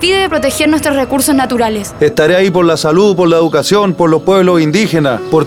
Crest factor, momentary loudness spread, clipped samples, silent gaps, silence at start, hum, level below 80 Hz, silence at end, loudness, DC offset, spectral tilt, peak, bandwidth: 10 dB; 4 LU; under 0.1%; none; 0 s; none; -40 dBFS; 0 s; -10 LUFS; under 0.1%; -5 dB/octave; 0 dBFS; 17.5 kHz